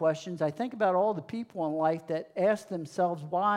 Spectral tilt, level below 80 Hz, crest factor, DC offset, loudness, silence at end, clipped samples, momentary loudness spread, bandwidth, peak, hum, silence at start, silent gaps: -6.5 dB/octave; -82 dBFS; 14 dB; under 0.1%; -30 LUFS; 0 s; under 0.1%; 8 LU; 12 kHz; -14 dBFS; none; 0 s; none